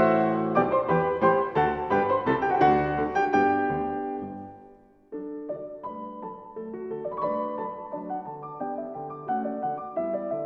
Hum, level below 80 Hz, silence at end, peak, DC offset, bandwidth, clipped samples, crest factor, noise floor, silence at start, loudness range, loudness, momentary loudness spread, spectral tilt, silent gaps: none; -54 dBFS; 0 s; -8 dBFS; under 0.1%; 6.2 kHz; under 0.1%; 18 dB; -53 dBFS; 0 s; 11 LU; -27 LUFS; 16 LU; -8 dB/octave; none